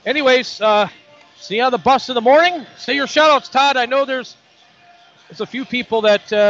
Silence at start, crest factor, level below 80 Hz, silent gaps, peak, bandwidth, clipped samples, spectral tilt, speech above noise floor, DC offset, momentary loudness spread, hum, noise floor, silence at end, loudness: 0.05 s; 16 dB; -60 dBFS; none; -2 dBFS; 7.8 kHz; under 0.1%; -3 dB/octave; 34 dB; under 0.1%; 12 LU; none; -50 dBFS; 0 s; -16 LUFS